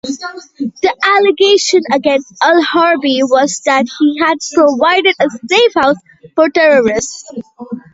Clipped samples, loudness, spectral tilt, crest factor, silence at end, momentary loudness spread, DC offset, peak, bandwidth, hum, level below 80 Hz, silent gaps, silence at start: under 0.1%; -11 LUFS; -2.5 dB/octave; 12 dB; 0.15 s; 14 LU; under 0.1%; 0 dBFS; 8 kHz; none; -54 dBFS; none; 0.05 s